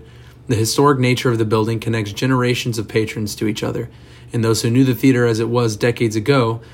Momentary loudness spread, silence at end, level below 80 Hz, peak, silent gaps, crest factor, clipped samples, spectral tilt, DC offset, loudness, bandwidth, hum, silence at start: 8 LU; 0 s; -48 dBFS; -2 dBFS; none; 16 dB; under 0.1%; -5.5 dB/octave; under 0.1%; -18 LUFS; 16.5 kHz; none; 0 s